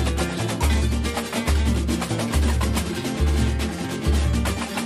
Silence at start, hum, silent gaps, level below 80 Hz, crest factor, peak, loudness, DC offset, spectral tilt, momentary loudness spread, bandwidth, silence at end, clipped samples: 0 s; none; none; -24 dBFS; 14 dB; -8 dBFS; -23 LUFS; under 0.1%; -5 dB/octave; 3 LU; 14.5 kHz; 0 s; under 0.1%